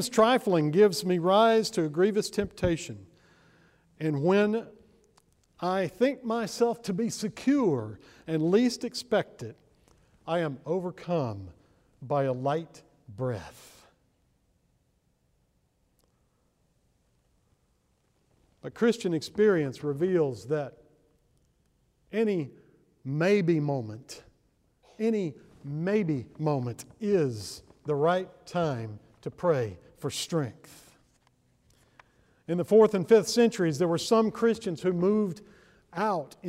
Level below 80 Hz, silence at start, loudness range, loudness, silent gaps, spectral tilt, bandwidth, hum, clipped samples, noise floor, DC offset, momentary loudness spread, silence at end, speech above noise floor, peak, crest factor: -62 dBFS; 0 s; 9 LU; -27 LUFS; none; -6 dB/octave; 16 kHz; none; under 0.1%; -71 dBFS; under 0.1%; 18 LU; 0 s; 44 dB; -10 dBFS; 20 dB